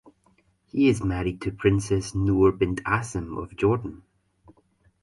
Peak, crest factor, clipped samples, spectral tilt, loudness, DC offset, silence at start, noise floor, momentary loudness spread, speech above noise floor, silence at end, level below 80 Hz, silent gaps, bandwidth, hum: -6 dBFS; 20 dB; under 0.1%; -6.5 dB/octave; -25 LUFS; under 0.1%; 0.75 s; -64 dBFS; 11 LU; 41 dB; 1.05 s; -42 dBFS; none; 11.5 kHz; none